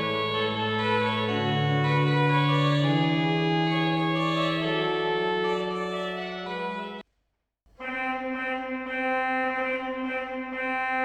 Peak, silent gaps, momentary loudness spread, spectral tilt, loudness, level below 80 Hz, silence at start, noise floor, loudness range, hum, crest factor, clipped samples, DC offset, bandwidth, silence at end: -12 dBFS; none; 9 LU; -7 dB/octave; -26 LUFS; -62 dBFS; 0 s; -77 dBFS; 8 LU; none; 14 dB; under 0.1%; under 0.1%; 8.8 kHz; 0 s